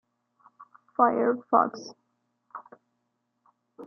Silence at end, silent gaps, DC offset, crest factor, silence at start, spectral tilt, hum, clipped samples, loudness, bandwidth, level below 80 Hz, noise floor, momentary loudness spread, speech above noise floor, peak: 0 s; none; under 0.1%; 24 dB; 0.6 s; -6 dB/octave; none; under 0.1%; -25 LUFS; 6.8 kHz; -82 dBFS; -78 dBFS; 23 LU; 53 dB; -8 dBFS